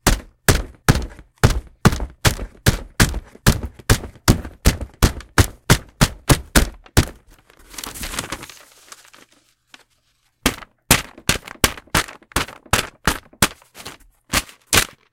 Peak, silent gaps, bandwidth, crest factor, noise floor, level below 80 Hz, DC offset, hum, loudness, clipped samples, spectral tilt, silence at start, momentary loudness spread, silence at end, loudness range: 0 dBFS; none; 17.5 kHz; 20 dB; -64 dBFS; -28 dBFS; under 0.1%; none; -20 LUFS; under 0.1%; -3.5 dB/octave; 0.05 s; 11 LU; 0.25 s; 9 LU